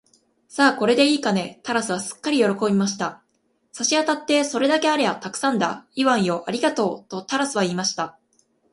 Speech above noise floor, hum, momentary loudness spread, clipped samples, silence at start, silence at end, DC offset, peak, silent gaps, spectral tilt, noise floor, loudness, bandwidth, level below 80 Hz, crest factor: 45 dB; none; 8 LU; under 0.1%; 0.5 s; 0.6 s; under 0.1%; -2 dBFS; none; -3.5 dB/octave; -66 dBFS; -21 LUFS; 11.5 kHz; -68 dBFS; 20 dB